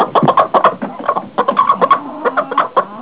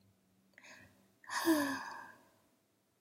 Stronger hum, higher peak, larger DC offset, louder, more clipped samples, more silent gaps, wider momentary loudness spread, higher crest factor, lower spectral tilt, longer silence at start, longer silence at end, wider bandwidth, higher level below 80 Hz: neither; first, 0 dBFS vs -20 dBFS; first, 0.3% vs under 0.1%; first, -14 LUFS vs -36 LUFS; neither; neither; second, 7 LU vs 25 LU; second, 14 dB vs 22 dB; first, -9.5 dB/octave vs -2.5 dB/octave; second, 0 s vs 0.65 s; second, 0 s vs 0.9 s; second, 4 kHz vs 16 kHz; first, -62 dBFS vs -86 dBFS